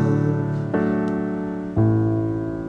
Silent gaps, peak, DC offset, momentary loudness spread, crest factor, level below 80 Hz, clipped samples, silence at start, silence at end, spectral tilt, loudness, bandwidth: none; -8 dBFS; under 0.1%; 6 LU; 14 dB; -44 dBFS; under 0.1%; 0 s; 0 s; -10.5 dB/octave; -22 LUFS; 6.8 kHz